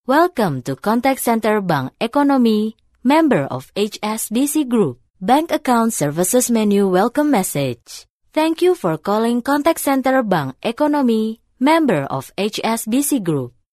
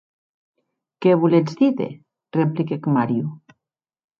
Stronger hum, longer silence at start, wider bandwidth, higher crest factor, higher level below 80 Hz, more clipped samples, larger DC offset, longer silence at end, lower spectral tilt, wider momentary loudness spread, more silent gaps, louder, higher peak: neither; second, 0.1 s vs 1 s; first, 14 kHz vs 7.2 kHz; about the same, 14 dB vs 18 dB; first, -56 dBFS vs -70 dBFS; neither; neither; second, 0.25 s vs 0.85 s; second, -5 dB/octave vs -9 dB/octave; second, 8 LU vs 11 LU; first, 5.10-5.14 s, 8.10-8.20 s vs none; about the same, -18 LUFS vs -20 LUFS; about the same, -2 dBFS vs -4 dBFS